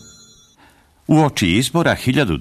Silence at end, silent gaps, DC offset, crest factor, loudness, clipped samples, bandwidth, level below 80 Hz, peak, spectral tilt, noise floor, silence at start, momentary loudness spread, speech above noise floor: 0 s; none; under 0.1%; 14 dB; -16 LUFS; under 0.1%; 13.5 kHz; -42 dBFS; -4 dBFS; -5.5 dB/octave; -52 dBFS; 1.1 s; 2 LU; 36 dB